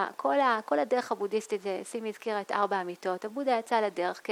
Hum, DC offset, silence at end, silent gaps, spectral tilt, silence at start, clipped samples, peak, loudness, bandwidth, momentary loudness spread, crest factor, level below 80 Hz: none; under 0.1%; 0 s; none; -4 dB/octave; 0 s; under 0.1%; -14 dBFS; -30 LUFS; 16 kHz; 8 LU; 16 dB; -88 dBFS